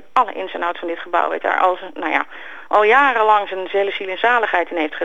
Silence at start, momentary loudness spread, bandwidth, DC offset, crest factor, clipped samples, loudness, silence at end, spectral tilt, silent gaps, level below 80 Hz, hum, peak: 0.15 s; 10 LU; 7.8 kHz; 1%; 16 dB; under 0.1%; -18 LUFS; 0 s; -3.5 dB/octave; none; -68 dBFS; none; -2 dBFS